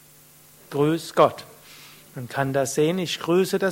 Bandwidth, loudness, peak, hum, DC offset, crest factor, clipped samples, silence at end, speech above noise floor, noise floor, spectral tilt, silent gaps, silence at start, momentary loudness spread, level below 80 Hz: 16.5 kHz; -23 LUFS; -4 dBFS; none; under 0.1%; 22 dB; under 0.1%; 0 s; 29 dB; -51 dBFS; -5 dB/octave; none; 0.7 s; 23 LU; -64 dBFS